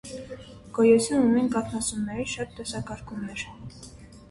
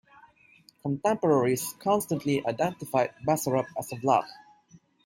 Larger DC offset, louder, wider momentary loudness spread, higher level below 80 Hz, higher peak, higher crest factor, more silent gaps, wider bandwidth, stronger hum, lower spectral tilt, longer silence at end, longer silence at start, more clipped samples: neither; about the same, -26 LUFS vs -27 LUFS; first, 23 LU vs 8 LU; first, -52 dBFS vs -68 dBFS; about the same, -8 dBFS vs -10 dBFS; about the same, 20 dB vs 18 dB; neither; second, 11.5 kHz vs 16.5 kHz; neither; about the same, -5 dB/octave vs -5.5 dB/octave; second, 0.05 s vs 0.7 s; second, 0.05 s vs 0.85 s; neither